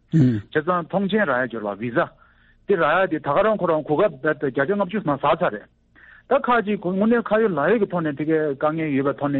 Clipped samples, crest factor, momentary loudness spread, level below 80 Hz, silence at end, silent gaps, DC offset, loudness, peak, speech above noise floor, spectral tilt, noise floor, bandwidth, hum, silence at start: under 0.1%; 14 dB; 5 LU; -56 dBFS; 0 s; none; under 0.1%; -21 LUFS; -6 dBFS; 34 dB; -5.5 dB/octave; -55 dBFS; 7.4 kHz; none; 0.15 s